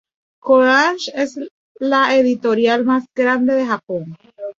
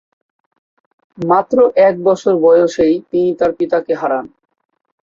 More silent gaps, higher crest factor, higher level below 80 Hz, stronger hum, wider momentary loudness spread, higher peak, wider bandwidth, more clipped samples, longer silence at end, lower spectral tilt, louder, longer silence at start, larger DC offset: first, 1.51-1.75 s vs none; about the same, 16 dB vs 14 dB; second, -64 dBFS vs -54 dBFS; neither; first, 17 LU vs 7 LU; about the same, -2 dBFS vs -2 dBFS; about the same, 7.6 kHz vs 7.4 kHz; neither; second, 0.1 s vs 0.8 s; second, -4.5 dB/octave vs -6.5 dB/octave; about the same, -16 LUFS vs -14 LUFS; second, 0.45 s vs 1.2 s; neither